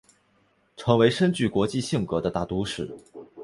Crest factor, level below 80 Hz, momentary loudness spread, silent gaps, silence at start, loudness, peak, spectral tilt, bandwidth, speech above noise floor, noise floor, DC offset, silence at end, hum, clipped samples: 22 dB; -52 dBFS; 15 LU; none; 0.8 s; -25 LUFS; -4 dBFS; -6 dB/octave; 11.5 kHz; 41 dB; -65 dBFS; under 0.1%; 0 s; none; under 0.1%